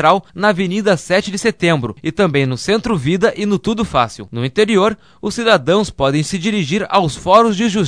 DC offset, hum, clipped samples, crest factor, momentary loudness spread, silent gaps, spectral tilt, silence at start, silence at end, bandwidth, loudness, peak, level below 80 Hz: 0.3%; none; under 0.1%; 16 dB; 6 LU; none; -5.5 dB/octave; 0 s; 0 s; 11 kHz; -15 LUFS; 0 dBFS; -42 dBFS